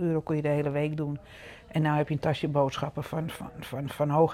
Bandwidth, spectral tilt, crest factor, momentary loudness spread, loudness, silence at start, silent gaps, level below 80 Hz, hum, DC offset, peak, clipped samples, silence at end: 14.5 kHz; -7.5 dB/octave; 18 dB; 11 LU; -29 LUFS; 0 s; none; -56 dBFS; none; under 0.1%; -10 dBFS; under 0.1%; 0 s